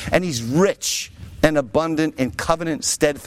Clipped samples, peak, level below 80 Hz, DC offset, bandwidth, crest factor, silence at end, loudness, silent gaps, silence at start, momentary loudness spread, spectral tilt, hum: under 0.1%; -2 dBFS; -42 dBFS; under 0.1%; 16.5 kHz; 18 dB; 0 s; -20 LUFS; none; 0 s; 5 LU; -4 dB/octave; none